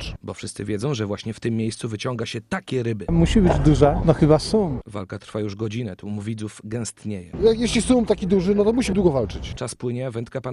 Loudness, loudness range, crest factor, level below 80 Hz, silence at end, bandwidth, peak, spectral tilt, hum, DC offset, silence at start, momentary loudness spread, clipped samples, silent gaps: -22 LUFS; 6 LU; 18 dB; -34 dBFS; 0 s; 12 kHz; -2 dBFS; -6.5 dB/octave; none; under 0.1%; 0 s; 14 LU; under 0.1%; none